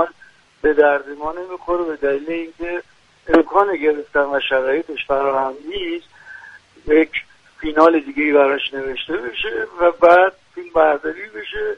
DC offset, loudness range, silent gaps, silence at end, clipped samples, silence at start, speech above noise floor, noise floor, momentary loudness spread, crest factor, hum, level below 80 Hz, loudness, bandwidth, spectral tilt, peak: under 0.1%; 5 LU; none; 0 s; under 0.1%; 0 s; 32 dB; -50 dBFS; 14 LU; 18 dB; none; -46 dBFS; -18 LUFS; 7.8 kHz; -5.5 dB/octave; 0 dBFS